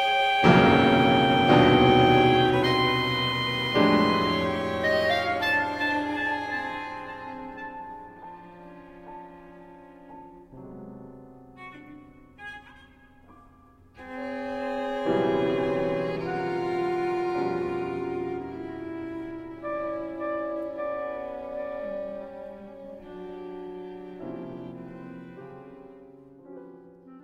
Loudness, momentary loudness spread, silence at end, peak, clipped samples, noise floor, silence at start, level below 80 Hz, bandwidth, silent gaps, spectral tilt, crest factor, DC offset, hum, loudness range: -24 LUFS; 26 LU; 0.05 s; -4 dBFS; under 0.1%; -55 dBFS; 0 s; -52 dBFS; 15.5 kHz; none; -6.5 dB/octave; 24 dB; under 0.1%; none; 25 LU